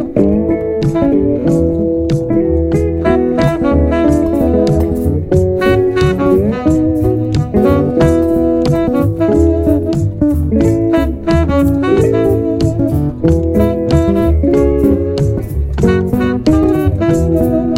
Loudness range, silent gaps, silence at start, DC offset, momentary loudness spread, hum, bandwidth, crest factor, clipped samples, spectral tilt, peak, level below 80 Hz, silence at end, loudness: 1 LU; none; 0 s; under 0.1%; 3 LU; none; 16 kHz; 12 dB; under 0.1%; -8.5 dB/octave; 0 dBFS; -22 dBFS; 0 s; -13 LUFS